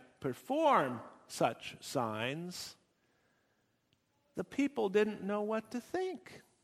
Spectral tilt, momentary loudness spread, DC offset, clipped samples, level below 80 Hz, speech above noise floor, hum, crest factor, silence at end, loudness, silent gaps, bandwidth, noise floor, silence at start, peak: -5 dB/octave; 16 LU; under 0.1%; under 0.1%; -76 dBFS; 42 dB; none; 22 dB; 0.25 s; -35 LUFS; none; 15.5 kHz; -77 dBFS; 0 s; -16 dBFS